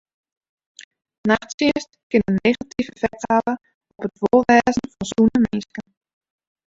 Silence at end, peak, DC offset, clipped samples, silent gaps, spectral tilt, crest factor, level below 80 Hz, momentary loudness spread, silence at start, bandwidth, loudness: 0.85 s; -2 dBFS; under 0.1%; under 0.1%; 1.54-1.58 s, 2.03-2.10 s, 3.74-3.81 s; -5.5 dB/octave; 20 dB; -50 dBFS; 13 LU; 1.25 s; 7.8 kHz; -20 LUFS